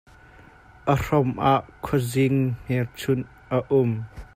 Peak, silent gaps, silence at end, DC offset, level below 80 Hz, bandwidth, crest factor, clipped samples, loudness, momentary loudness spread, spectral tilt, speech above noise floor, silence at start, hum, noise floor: -6 dBFS; none; 0.1 s; under 0.1%; -48 dBFS; 16 kHz; 18 dB; under 0.1%; -24 LUFS; 6 LU; -7 dB/octave; 27 dB; 0.85 s; none; -50 dBFS